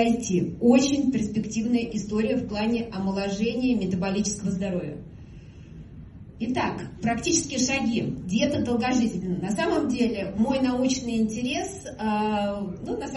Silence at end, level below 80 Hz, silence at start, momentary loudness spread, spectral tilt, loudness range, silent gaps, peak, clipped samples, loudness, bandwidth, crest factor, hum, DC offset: 0 s; -48 dBFS; 0 s; 12 LU; -5 dB/octave; 5 LU; none; -8 dBFS; under 0.1%; -25 LUFS; 11.5 kHz; 18 dB; none; under 0.1%